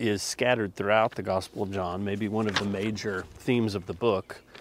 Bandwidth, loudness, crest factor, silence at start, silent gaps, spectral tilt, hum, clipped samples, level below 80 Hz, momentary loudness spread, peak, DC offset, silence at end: 16 kHz; -28 LUFS; 20 dB; 0 s; none; -5 dB/octave; none; under 0.1%; -60 dBFS; 8 LU; -8 dBFS; under 0.1%; 0 s